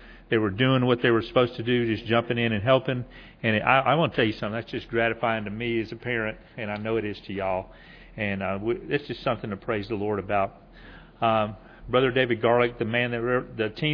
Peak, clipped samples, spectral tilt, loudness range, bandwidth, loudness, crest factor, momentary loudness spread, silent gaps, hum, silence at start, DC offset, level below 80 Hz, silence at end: -4 dBFS; under 0.1%; -8.5 dB/octave; 6 LU; 5.4 kHz; -26 LUFS; 22 dB; 10 LU; none; none; 0 s; under 0.1%; -52 dBFS; 0 s